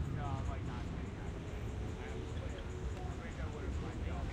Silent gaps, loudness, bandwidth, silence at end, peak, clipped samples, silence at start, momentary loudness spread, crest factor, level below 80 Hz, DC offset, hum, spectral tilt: none; -43 LUFS; 10.5 kHz; 0 s; -26 dBFS; under 0.1%; 0 s; 4 LU; 14 dB; -44 dBFS; under 0.1%; none; -7 dB/octave